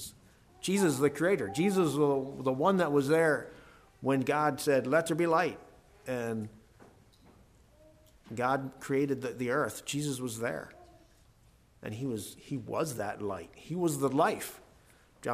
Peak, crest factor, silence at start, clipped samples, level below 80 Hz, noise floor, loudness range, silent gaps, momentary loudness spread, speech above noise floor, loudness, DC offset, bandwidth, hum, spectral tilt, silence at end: -14 dBFS; 18 dB; 0 s; under 0.1%; -66 dBFS; -63 dBFS; 10 LU; none; 14 LU; 32 dB; -31 LUFS; under 0.1%; 15.5 kHz; none; -5.5 dB/octave; 0 s